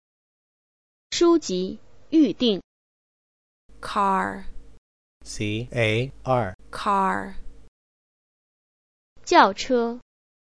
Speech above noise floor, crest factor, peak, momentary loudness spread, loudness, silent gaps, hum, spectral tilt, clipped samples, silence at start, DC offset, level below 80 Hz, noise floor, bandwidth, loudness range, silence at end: over 68 dB; 24 dB; -2 dBFS; 19 LU; -23 LUFS; 2.64-3.69 s, 4.78-5.21 s, 6.54-6.59 s, 7.68-9.16 s; none; -5 dB/octave; under 0.1%; 1.1 s; 0.5%; -48 dBFS; under -90 dBFS; 11 kHz; 4 LU; 0.55 s